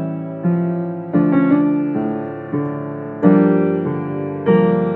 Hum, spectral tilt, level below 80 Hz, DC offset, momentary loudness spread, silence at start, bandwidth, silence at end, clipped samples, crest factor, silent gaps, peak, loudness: none; -12 dB/octave; -60 dBFS; under 0.1%; 11 LU; 0 s; 4 kHz; 0 s; under 0.1%; 16 dB; none; 0 dBFS; -18 LUFS